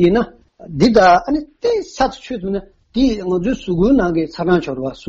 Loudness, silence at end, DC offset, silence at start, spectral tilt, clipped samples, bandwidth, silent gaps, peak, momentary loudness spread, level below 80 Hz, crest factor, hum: -16 LUFS; 0.1 s; under 0.1%; 0 s; -6.5 dB/octave; under 0.1%; 8 kHz; none; -2 dBFS; 14 LU; -36 dBFS; 14 dB; none